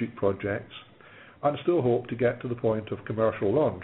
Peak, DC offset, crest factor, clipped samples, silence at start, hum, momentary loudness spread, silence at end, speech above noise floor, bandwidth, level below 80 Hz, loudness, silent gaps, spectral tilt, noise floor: -10 dBFS; under 0.1%; 16 dB; under 0.1%; 0 s; none; 9 LU; 0 s; 24 dB; 4 kHz; -60 dBFS; -28 LUFS; none; -6.5 dB/octave; -51 dBFS